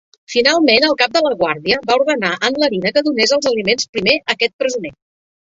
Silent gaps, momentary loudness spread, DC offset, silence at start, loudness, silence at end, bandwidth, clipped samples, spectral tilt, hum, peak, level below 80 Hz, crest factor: 3.89-3.93 s, 4.53-4.59 s; 7 LU; under 0.1%; 0.3 s; -15 LUFS; 0.5 s; 8 kHz; under 0.1%; -3 dB/octave; none; 0 dBFS; -56 dBFS; 16 dB